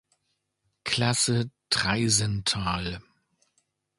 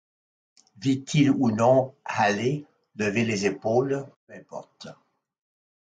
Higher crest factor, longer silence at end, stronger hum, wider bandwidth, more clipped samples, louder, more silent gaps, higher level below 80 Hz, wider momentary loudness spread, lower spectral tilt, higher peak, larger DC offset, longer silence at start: about the same, 22 dB vs 18 dB; about the same, 1 s vs 0.9 s; neither; first, 11.5 kHz vs 9.2 kHz; neither; about the same, -25 LUFS vs -24 LUFS; second, none vs 4.16-4.27 s; first, -50 dBFS vs -66 dBFS; second, 11 LU vs 22 LU; second, -3 dB/octave vs -6 dB/octave; about the same, -8 dBFS vs -8 dBFS; neither; about the same, 0.85 s vs 0.8 s